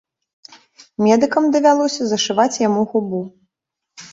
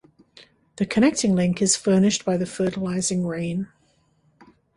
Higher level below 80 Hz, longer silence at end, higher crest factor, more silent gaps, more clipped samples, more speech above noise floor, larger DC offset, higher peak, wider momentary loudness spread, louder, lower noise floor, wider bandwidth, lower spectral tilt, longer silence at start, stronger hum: second, -64 dBFS vs -56 dBFS; second, 0.05 s vs 1.1 s; about the same, 16 dB vs 18 dB; neither; neither; first, 64 dB vs 42 dB; neither; first, -2 dBFS vs -6 dBFS; about the same, 12 LU vs 10 LU; first, -17 LUFS vs -22 LUFS; first, -80 dBFS vs -63 dBFS; second, 8 kHz vs 11.5 kHz; about the same, -4.5 dB/octave vs -4.5 dB/octave; first, 1 s vs 0.75 s; neither